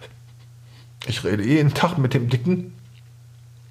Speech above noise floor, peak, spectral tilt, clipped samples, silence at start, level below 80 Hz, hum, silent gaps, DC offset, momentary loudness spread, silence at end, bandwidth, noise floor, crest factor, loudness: 25 dB; -4 dBFS; -6.5 dB/octave; under 0.1%; 0 s; -56 dBFS; none; none; under 0.1%; 11 LU; 0.9 s; 15 kHz; -46 dBFS; 20 dB; -21 LUFS